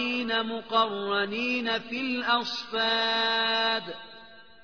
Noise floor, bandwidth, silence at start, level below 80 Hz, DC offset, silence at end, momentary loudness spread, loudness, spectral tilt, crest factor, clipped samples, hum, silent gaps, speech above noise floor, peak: -51 dBFS; 5.4 kHz; 0 s; -70 dBFS; 0.2%; 0.2 s; 7 LU; -26 LUFS; -3.5 dB/octave; 16 dB; under 0.1%; none; none; 23 dB; -12 dBFS